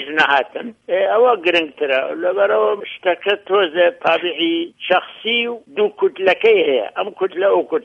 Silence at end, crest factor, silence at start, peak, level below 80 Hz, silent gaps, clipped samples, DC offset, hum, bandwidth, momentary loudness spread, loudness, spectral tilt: 0.05 s; 16 dB; 0 s; -2 dBFS; -68 dBFS; none; under 0.1%; under 0.1%; none; 8 kHz; 8 LU; -17 LUFS; -4.5 dB/octave